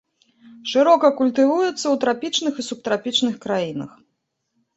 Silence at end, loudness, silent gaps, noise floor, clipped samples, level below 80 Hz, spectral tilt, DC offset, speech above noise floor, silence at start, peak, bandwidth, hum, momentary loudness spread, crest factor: 0.9 s; -20 LUFS; none; -74 dBFS; under 0.1%; -68 dBFS; -3.5 dB/octave; under 0.1%; 55 dB; 0.55 s; -2 dBFS; 8.2 kHz; none; 13 LU; 18 dB